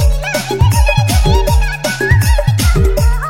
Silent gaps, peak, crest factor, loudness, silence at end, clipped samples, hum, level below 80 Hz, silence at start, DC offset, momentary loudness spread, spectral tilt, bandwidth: none; 0 dBFS; 10 dB; -13 LUFS; 0 s; under 0.1%; none; -14 dBFS; 0 s; under 0.1%; 5 LU; -5 dB/octave; 16.5 kHz